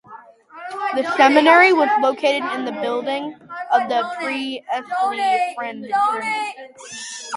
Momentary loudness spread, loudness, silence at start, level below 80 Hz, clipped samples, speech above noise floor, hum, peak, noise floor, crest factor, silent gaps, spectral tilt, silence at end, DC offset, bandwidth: 19 LU; -18 LUFS; 0.1 s; -72 dBFS; under 0.1%; 24 dB; none; 0 dBFS; -43 dBFS; 20 dB; none; -2.5 dB/octave; 0 s; under 0.1%; 11.5 kHz